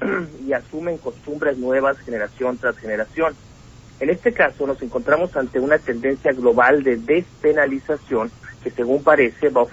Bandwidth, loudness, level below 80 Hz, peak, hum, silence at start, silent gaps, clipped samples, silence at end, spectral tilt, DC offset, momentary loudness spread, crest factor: 8 kHz; -20 LUFS; -50 dBFS; -2 dBFS; none; 0 s; none; under 0.1%; 0 s; -7 dB/octave; under 0.1%; 10 LU; 18 dB